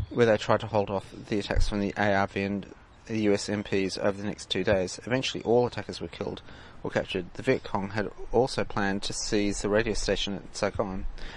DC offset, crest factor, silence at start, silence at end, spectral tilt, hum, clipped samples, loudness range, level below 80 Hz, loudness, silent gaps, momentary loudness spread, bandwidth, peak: under 0.1%; 22 dB; 0 s; 0 s; -5 dB/octave; none; under 0.1%; 2 LU; -40 dBFS; -29 LUFS; none; 10 LU; 11.5 kHz; -6 dBFS